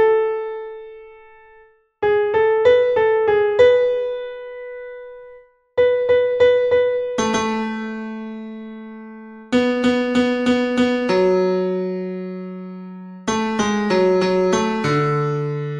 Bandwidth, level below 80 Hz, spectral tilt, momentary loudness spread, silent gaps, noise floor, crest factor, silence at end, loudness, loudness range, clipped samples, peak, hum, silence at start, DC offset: 10 kHz; -52 dBFS; -5.5 dB/octave; 19 LU; none; -51 dBFS; 16 dB; 0 s; -18 LUFS; 4 LU; under 0.1%; -2 dBFS; none; 0 s; under 0.1%